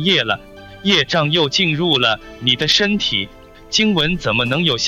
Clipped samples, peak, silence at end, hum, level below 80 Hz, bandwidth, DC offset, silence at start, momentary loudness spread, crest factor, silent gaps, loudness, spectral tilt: under 0.1%; -2 dBFS; 0 s; none; -44 dBFS; 15.5 kHz; under 0.1%; 0 s; 7 LU; 16 dB; none; -16 LUFS; -4 dB/octave